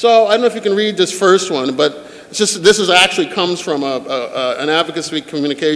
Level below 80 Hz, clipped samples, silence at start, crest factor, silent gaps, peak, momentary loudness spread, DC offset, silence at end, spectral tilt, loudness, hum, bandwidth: -58 dBFS; under 0.1%; 0 s; 14 dB; none; 0 dBFS; 10 LU; under 0.1%; 0 s; -3 dB/octave; -14 LUFS; none; 11 kHz